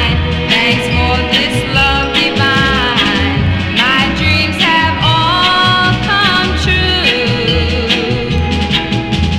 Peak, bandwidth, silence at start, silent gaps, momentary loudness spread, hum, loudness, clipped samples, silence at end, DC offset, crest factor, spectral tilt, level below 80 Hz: 0 dBFS; 14.5 kHz; 0 s; none; 4 LU; none; -11 LUFS; under 0.1%; 0 s; under 0.1%; 12 dB; -5 dB/octave; -24 dBFS